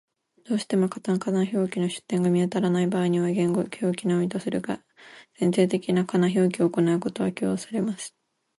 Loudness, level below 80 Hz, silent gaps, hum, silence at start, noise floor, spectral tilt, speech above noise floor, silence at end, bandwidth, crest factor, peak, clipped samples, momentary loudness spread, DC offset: -25 LUFS; -68 dBFS; none; none; 0.5 s; -50 dBFS; -6.5 dB/octave; 26 dB; 0.5 s; 11.5 kHz; 16 dB; -8 dBFS; under 0.1%; 7 LU; under 0.1%